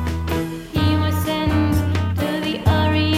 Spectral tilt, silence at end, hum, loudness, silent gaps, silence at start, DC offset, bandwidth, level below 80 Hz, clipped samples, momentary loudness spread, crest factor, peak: -6.5 dB/octave; 0 s; none; -20 LUFS; none; 0 s; under 0.1%; 15.5 kHz; -32 dBFS; under 0.1%; 6 LU; 14 dB; -4 dBFS